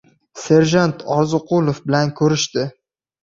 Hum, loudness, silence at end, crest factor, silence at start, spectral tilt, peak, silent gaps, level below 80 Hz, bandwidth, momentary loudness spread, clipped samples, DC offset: none; -17 LUFS; 0.5 s; 16 dB; 0.35 s; -5.5 dB/octave; -2 dBFS; none; -54 dBFS; 7.8 kHz; 9 LU; under 0.1%; under 0.1%